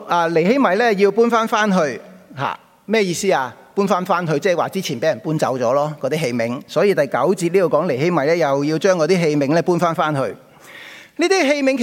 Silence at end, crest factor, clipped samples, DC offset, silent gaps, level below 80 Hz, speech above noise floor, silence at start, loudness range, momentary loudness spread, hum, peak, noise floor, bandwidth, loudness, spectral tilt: 0 s; 16 dB; under 0.1%; under 0.1%; none; -68 dBFS; 23 dB; 0 s; 3 LU; 10 LU; none; -2 dBFS; -40 dBFS; 16.5 kHz; -18 LUFS; -5.5 dB/octave